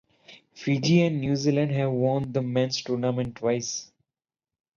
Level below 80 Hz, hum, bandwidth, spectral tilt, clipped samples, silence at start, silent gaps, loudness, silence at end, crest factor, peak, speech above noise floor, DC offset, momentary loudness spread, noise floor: -60 dBFS; none; 7.4 kHz; -6 dB/octave; under 0.1%; 0.3 s; none; -26 LUFS; 0.9 s; 16 dB; -10 dBFS; over 65 dB; under 0.1%; 7 LU; under -90 dBFS